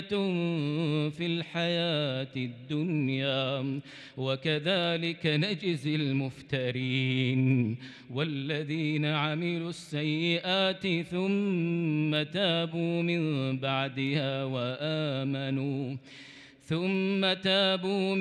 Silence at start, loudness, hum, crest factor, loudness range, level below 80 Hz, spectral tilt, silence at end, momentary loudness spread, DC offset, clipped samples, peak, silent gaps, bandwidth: 0 s; -30 LUFS; none; 16 dB; 2 LU; -72 dBFS; -6.5 dB/octave; 0 s; 7 LU; under 0.1%; under 0.1%; -14 dBFS; none; 10.5 kHz